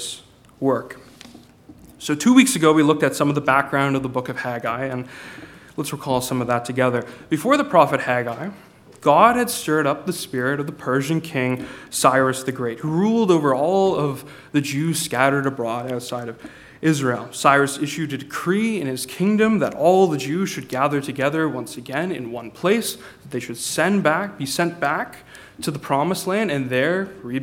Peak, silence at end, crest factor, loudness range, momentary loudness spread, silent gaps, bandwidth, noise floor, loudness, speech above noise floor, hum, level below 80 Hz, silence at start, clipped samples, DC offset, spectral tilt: 0 dBFS; 0 s; 20 dB; 5 LU; 14 LU; none; 17 kHz; -46 dBFS; -20 LUFS; 26 dB; none; -60 dBFS; 0 s; under 0.1%; under 0.1%; -5 dB/octave